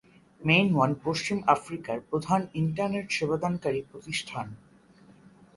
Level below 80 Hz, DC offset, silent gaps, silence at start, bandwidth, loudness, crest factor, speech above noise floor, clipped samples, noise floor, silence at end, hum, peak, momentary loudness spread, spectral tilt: -62 dBFS; under 0.1%; none; 0.4 s; 11.5 kHz; -28 LUFS; 22 dB; 29 dB; under 0.1%; -56 dBFS; 1 s; none; -8 dBFS; 12 LU; -5.5 dB/octave